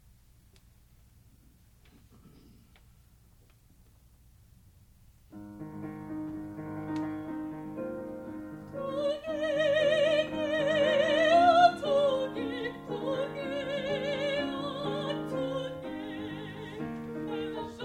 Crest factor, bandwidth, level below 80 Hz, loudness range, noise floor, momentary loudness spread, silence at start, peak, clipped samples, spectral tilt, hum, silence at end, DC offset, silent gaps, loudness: 22 dB; 15.5 kHz; -62 dBFS; 16 LU; -60 dBFS; 17 LU; 2.25 s; -10 dBFS; under 0.1%; -5.5 dB/octave; none; 0 s; under 0.1%; none; -30 LUFS